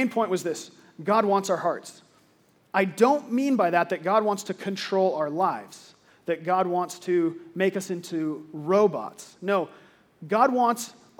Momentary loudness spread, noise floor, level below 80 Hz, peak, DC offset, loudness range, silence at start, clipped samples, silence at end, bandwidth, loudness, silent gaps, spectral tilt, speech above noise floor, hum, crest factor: 13 LU; -62 dBFS; -82 dBFS; -6 dBFS; under 0.1%; 3 LU; 0 s; under 0.1%; 0.3 s; 19 kHz; -25 LUFS; none; -5 dB/octave; 37 dB; none; 20 dB